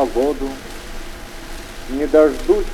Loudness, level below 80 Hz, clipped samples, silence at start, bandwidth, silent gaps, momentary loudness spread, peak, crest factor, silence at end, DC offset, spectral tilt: -18 LUFS; -30 dBFS; under 0.1%; 0 s; 17.5 kHz; none; 20 LU; -2 dBFS; 16 dB; 0 s; under 0.1%; -5 dB/octave